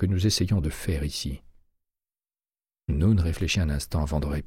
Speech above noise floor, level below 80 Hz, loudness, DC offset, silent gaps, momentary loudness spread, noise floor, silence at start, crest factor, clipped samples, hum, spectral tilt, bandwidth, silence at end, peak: over 65 dB; -34 dBFS; -26 LUFS; under 0.1%; none; 10 LU; under -90 dBFS; 0 s; 16 dB; under 0.1%; none; -5.5 dB/octave; 16 kHz; 0 s; -10 dBFS